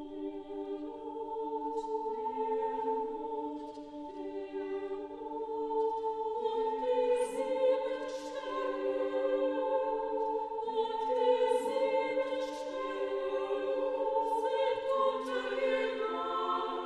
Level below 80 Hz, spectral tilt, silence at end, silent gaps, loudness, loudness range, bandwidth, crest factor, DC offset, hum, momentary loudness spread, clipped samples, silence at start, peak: -70 dBFS; -3.5 dB/octave; 0 s; none; -34 LUFS; 5 LU; 12 kHz; 16 dB; under 0.1%; none; 10 LU; under 0.1%; 0 s; -16 dBFS